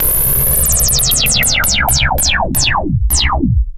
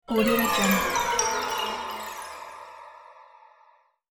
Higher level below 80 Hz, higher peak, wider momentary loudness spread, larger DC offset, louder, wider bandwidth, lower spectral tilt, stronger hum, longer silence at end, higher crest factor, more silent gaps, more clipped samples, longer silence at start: first, -20 dBFS vs -52 dBFS; first, 0 dBFS vs -8 dBFS; second, 4 LU vs 21 LU; neither; first, -11 LUFS vs -25 LUFS; second, 16.5 kHz vs 19 kHz; about the same, -2 dB/octave vs -3 dB/octave; neither; second, 0 s vs 0.85 s; second, 12 dB vs 20 dB; neither; neither; about the same, 0 s vs 0.1 s